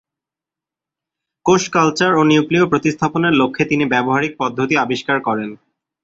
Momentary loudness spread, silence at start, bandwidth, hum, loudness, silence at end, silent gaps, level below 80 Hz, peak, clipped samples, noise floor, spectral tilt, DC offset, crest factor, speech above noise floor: 7 LU; 1.45 s; 7.8 kHz; none; -16 LUFS; 0.5 s; none; -54 dBFS; 0 dBFS; under 0.1%; -87 dBFS; -5 dB/octave; under 0.1%; 16 dB; 72 dB